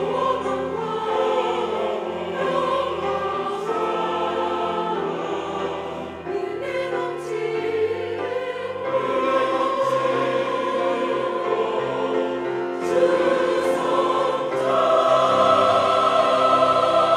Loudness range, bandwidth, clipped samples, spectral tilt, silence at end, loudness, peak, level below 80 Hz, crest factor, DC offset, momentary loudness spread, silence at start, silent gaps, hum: 7 LU; 12.5 kHz; under 0.1%; -5 dB/octave; 0 s; -22 LUFS; -4 dBFS; -62 dBFS; 16 dB; under 0.1%; 10 LU; 0 s; none; none